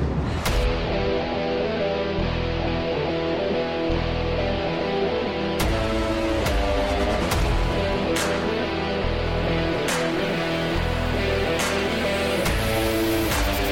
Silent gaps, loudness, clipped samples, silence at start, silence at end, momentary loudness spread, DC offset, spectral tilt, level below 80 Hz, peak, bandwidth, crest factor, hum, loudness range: none; -24 LUFS; under 0.1%; 0 s; 0 s; 2 LU; under 0.1%; -5 dB/octave; -30 dBFS; -12 dBFS; 16.5 kHz; 12 dB; none; 2 LU